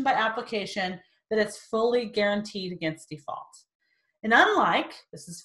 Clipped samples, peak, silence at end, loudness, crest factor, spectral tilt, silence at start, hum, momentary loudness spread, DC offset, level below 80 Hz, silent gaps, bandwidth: under 0.1%; -6 dBFS; 0.05 s; -26 LUFS; 20 dB; -4 dB/octave; 0 s; none; 19 LU; under 0.1%; -68 dBFS; 3.75-3.80 s; 12.5 kHz